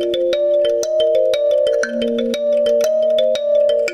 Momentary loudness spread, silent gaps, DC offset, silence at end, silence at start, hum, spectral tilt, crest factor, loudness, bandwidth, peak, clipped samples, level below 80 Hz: 3 LU; none; under 0.1%; 0 s; 0 s; none; -3 dB/octave; 10 dB; -16 LUFS; 14 kHz; -6 dBFS; under 0.1%; -54 dBFS